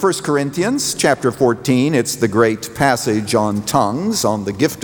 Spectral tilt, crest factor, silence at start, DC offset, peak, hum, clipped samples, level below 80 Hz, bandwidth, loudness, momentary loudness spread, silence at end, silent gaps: -4.5 dB/octave; 16 dB; 0 s; under 0.1%; -2 dBFS; none; under 0.1%; -50 dBFS; over 20 kHz; -17 LUFS; 3 LU; 0 s; none